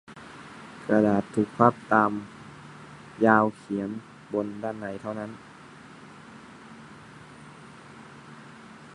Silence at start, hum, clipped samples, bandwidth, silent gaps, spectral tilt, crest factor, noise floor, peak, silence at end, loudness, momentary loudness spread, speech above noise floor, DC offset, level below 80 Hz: 0.1 s; none; under 0.1%; 11 kHz; none; -7.5 dB/octave; 26 dB; -48 dBFS; -2 dBFS; 0.05 s; -25 LUFS; 25 LU; 23 dB; under 0.1%; -64 dBFS